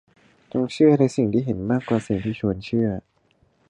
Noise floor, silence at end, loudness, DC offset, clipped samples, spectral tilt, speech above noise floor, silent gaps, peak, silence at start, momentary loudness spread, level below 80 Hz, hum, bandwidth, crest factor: -63 dBFS; 0.7 s; -22 LUFS; under 0.1%; under 0.1%; -8 dB/octave; 42 dB; none; -6 dBFS; 0.55 s; 9 LU; -50 dBFS; none; 10.5 kHz; 18 dB